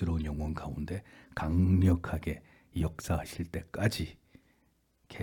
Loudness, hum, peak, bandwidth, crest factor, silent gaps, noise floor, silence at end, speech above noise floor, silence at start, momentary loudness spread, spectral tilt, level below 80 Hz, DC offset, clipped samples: -33 LUFS; none; -14 dBFS; 18 kHz; 18 dB; none; -71 dBFS; 0 s; 40 dB; 0 s; 15 LU; -7 dB/octave; -46 dBFS; under 0.1%; under 0.1%